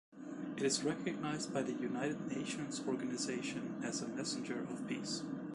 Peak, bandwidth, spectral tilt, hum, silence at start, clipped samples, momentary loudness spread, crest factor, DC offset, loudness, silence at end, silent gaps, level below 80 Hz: -22 dBFS; 11.5 kHz; -4 dB/octave; none; 0.1 s; under 0.1%; 6 LU; 18 dB; under 0.1%; -40 LUFS; 0 s; none; -76 dBFS